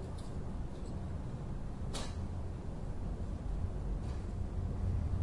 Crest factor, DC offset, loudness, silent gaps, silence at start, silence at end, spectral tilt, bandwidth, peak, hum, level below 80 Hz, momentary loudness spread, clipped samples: 14 dB; under 0.1%; -42 LUFS; none; 0 s; 0 s; -7 dB/octave; 11.5 kHz; -24 dBFS; none; -42 dBFS; 6 LU; under 0.1%